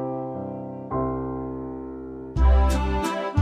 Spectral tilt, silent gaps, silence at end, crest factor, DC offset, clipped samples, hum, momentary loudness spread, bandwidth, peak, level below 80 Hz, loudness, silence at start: -7 dB/octave; none; 0 s; 16 dB; under 0.1%; under 0.1%; none; 14 LU; 14 kHz; -8 dBFS; -26 dBFS; -26 LUFS; 0 s